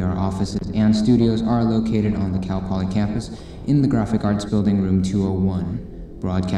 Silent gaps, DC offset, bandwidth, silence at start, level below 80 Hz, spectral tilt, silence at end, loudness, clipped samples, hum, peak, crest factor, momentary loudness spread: none; under 0.1%; 10.5 kHz; 0 s; -38 dBFS; -8 dB/octave; 0 s; -20 LUFS; under 0.1%; none; -6 dBFS; 14 dB; 11 LU